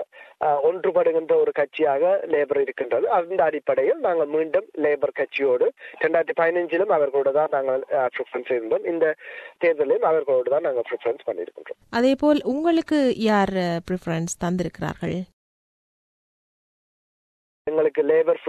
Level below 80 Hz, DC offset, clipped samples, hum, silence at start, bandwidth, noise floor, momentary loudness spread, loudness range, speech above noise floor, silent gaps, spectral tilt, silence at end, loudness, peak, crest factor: -58 dBFS; under 0.1%; under 0.1%; none; 0 s; 12 kHz; under -90 dBFS; 8 LU; 7 LU; over 68 dB; 15.33-17.65 s; -6 dB/octave; 0 s; -22 LUFS; -6 dBFS; 16 dB